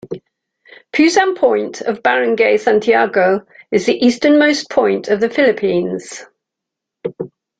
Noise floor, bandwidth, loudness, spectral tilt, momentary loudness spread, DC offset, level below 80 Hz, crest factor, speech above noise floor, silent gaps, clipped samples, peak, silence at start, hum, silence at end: -81 dBFS; 9.2 kHz; -14 LUFS; -4.5 dB/octave; 16 LU; under 0.1%; -58 dBFS; 14 dB; 68 dB; none; under 0.1%; 0 dBFS; 0.05 s; none; 0.3 s